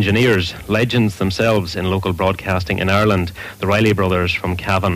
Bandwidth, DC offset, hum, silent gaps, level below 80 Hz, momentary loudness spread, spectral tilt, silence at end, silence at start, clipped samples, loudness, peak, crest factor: 15.5 kHz; under 0.1%; none; none; -38 dBFS; 5 LU; -6 dB/octave; 0 s; 0 s; under 0.1%; -17 LUFS; -4 dBFS; 12 dB